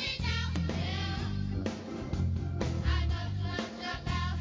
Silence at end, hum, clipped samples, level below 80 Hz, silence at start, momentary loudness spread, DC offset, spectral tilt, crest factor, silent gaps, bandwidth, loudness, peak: 0 s; none; under 0.1%; -38 dBFS; 0 s; 6 LU; under 0.1%; -6 dB/octave; 16 dB; none; 7.6 kHz; -34 LUFS; -16 dBFS